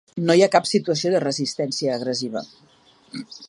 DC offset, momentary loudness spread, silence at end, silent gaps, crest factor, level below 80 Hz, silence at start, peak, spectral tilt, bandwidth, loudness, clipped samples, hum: under 0.1%; 18 LU; 0.05 s; none; 20 dB; -72 dBFS; 0.15 s; -2 dBFS; -4.5 dB/octave; 11.5 kHz; -21 LUFS; under 0.1%; none